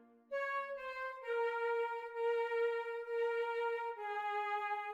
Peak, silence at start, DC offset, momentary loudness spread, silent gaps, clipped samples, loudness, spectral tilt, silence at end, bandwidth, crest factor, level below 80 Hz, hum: -28 dBFS; 0 s; under 0.1%; 6 LU; none; under 0.1%; -39 LUFS; -1 dB/octave; 0 s; 7.8 kHz; 12 dB; -86 dBFS; none